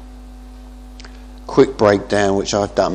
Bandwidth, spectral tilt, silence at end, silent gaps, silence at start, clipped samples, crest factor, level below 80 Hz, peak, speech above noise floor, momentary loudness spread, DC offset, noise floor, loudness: 10 kHz; -5 dB/octave; 0 s; none; 0 s; under 0.1%; 18 dB; -38 dBFS; 0 dBFS; 21 dB; 24 LU; under 0.1%; -36 dBFS; -16 LUFS